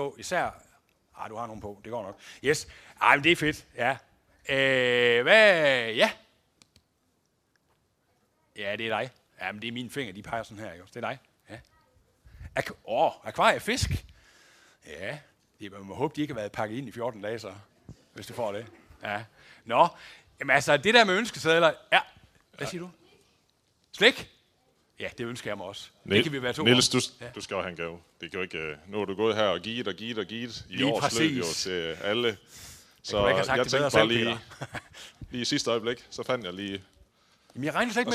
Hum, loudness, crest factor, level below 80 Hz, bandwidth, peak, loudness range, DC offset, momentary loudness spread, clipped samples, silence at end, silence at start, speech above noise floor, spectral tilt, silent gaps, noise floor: none; -27 LUFS; 24 dB; -56 dBFS; 15.5 kHz; -4 dBFS; 12 LU; under 0.1%; 20 LU; under 0.1%; 0 s; 0 s; 45 dB; -3.5 dB/octave; none; -72 dBFS